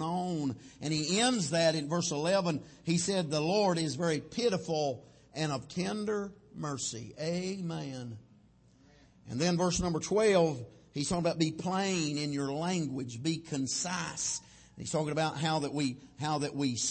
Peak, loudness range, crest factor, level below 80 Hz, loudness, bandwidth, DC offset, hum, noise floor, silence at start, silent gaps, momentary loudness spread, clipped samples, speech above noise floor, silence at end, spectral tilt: -14 dBFS; 6 LU; 18 dB; -60 dBFS; -32 LUFS; 8.8 kHz; under 0.1%; none; -62 dBFS; 0 s; none; 11 LU; under 0.1%; 30 dB; 0 s; -4.5 dB/octave